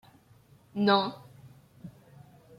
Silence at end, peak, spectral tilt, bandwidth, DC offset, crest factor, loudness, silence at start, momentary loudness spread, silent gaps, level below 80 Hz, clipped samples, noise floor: 0.7 s; -10 dBFS; -7 dB/octave; 10.5 kHz; under 0.1%; 24 dB; -27 LUFS; 0.75 s; 25 LU; none; -72 dBFS; under 0.1%; -59 dBFS